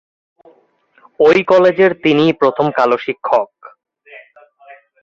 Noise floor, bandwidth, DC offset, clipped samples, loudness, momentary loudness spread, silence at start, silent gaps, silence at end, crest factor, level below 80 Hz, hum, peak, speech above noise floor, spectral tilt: -54 dBFS; 7.4 kHz; under 0.1%; under 0.1%; -13 LUFS; 7 LU; 1.2 s; none; 0.85 s; 14 dB; -60 dBFS; none; 0 dBFS; 42 dB; -6.5 dB/octave